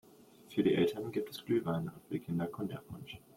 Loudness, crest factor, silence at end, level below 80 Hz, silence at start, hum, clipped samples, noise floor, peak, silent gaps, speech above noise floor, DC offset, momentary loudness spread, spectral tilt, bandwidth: -35 LUFS; 18 dB; 0.2 s; -70 dBFS; 0.5 s; none; under 0.1%; -59 dBFS; -18 dBFS; none; 23 dB; under 0.1%; 13 LU; -7 dB/octave; 16.5 kHz